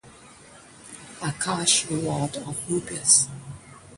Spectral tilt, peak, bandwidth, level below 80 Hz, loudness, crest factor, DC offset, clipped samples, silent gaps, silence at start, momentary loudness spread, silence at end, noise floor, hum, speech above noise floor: -2.5 dB/octave; -4 dBFS; 11.5 kHz; -58 dBFS; -23 LUFS; 24 dB; under 0.1%; under 0.1%; none; 0.05 s; 25 LU; 0 s; -49 dBFS; none; 24 dB